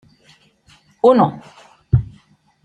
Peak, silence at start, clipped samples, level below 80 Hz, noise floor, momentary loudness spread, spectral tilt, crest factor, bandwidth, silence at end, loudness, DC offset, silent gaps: -2 dBFS; 1.05 s; under 0.1%; -40 dBFS; -53 dBFS; 22 LU; -9.5 dB/octave; 18 dB; 9.2 kHz; 0.6 s; -16 LUFS; under 0.1%; none